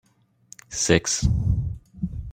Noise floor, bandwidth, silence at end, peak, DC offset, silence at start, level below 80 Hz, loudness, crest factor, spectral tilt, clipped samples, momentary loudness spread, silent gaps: -52 dBFS; 16 kHz; 0 s; -4 dBFS; under 0.1%; 0.7 s; -34 dBFS; -24 LUFS; 22 dB; -4 dB/octave; under 0.1%; 13 LU; none